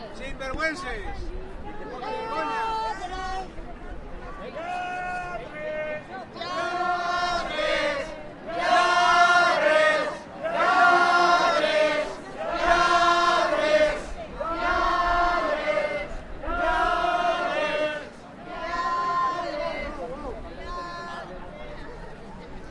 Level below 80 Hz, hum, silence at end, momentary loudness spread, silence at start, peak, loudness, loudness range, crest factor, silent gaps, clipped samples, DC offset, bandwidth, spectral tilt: -42 dBFS; none; 0 s; 20 LU; 0 s; -6 dBFS; -24 LUFS; 12 LU; 18 dB; none; under 0.1%; under 0.1%; 11.5 kHz; -3.5 dB/octave